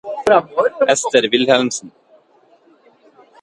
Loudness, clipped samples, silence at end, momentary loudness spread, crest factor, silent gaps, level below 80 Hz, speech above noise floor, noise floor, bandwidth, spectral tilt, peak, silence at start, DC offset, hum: -15 LUFS; under 0.1%; 1.55 s; 6 LU; 18 dB; none; -62 dBFS; 38 dB; -53 dBFS; 11.5 kHz; -2.5 dB/octave; 0 dBFS; 0.05 s; under 0.1%; none